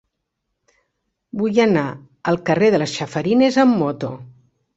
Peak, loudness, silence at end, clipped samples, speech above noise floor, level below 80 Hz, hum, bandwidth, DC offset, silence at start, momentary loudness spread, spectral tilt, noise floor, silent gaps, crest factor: -2 dBFS; -18 LUFS; 0.5 s; under 0.1%; 59 dB; -58 dBFS; none; 8 kHz; under 0.1%; 1.35 s; 13 LU; -6 dB/octave; -76 dBFS; none; 18 dB